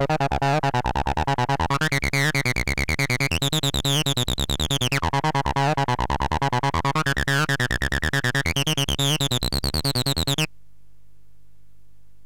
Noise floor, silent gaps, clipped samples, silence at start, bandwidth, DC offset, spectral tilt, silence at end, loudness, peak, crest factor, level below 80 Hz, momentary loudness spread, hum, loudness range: -59 dBFS; none; under 0.1%; 0 s; 17 kHz; 1%; -4 dB/octave; 1.8 s; -22 LUFS; -10 dBFS; 14 dB; -34 dBFS; 3 LU; 50 Hz at -45 dBFS; 1 LU